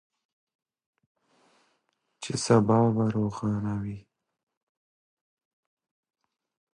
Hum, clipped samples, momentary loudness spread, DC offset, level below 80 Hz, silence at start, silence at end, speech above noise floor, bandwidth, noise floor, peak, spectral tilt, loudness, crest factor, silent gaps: none; under 0.1%; 17 LU; under 0.1%; -60 dBFS; 2.2 s; 2.75 s; 51 dB; 11 kHz; -75 dBFS; -8 dBFS; -6.5 dB/octave; -26 LUFS; 22 dB; none